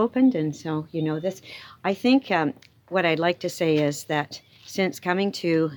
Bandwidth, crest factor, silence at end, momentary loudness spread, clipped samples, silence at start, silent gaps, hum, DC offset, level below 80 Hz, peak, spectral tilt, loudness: 19.5 kHz; 18 dB; 0 s; 13 LU; under 0.1%; 0 s; none; none; under 0.1%; -72 dBFS; -6 dBFS; -5.5 dB/octave; -24 LUFS